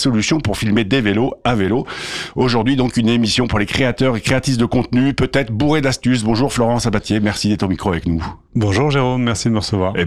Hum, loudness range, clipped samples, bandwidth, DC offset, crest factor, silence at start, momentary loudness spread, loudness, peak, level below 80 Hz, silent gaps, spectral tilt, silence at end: none; 1 LU; under 0.1%; 13.5 kHz; under 0.1%; 12 dB; 0 s; 4 LU; -17 LUFS; -4 dBFS; -36 dBFS; none; -5.5 dB/octave; 0 s